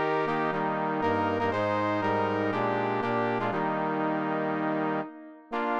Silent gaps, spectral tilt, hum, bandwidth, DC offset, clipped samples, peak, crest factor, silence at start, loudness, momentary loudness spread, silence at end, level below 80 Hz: none; -7.5 dB/octave; none; 7.8 kHz; under 0.1%; under 0.1%; -14 dBFS; 14 dB; 0 s; -28 LUFS; 4 LU; 0 s; -66 dBFS